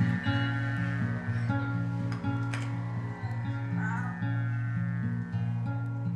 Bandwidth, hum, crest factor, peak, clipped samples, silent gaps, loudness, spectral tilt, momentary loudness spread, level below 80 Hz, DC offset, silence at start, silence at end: 8.4 kHz; none; 14 dB; -16 dBFS; under 0.1%; none; -32 LUFS; -7.5 dB/octave; 4 LU; -56 dBFS; under 0.1%; 0 s; 0 s